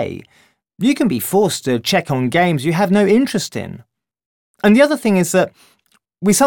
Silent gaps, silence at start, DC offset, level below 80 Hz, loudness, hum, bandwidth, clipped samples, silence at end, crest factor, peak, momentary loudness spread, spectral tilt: 4.26-4.54 s; 0 s; under 0.1%; -56 dBFS; -16 LUFS; none; 18 kHz; under 0.1%; 0 s; 16 dB; -2 dBFS; 11 LU; -5 dB/octave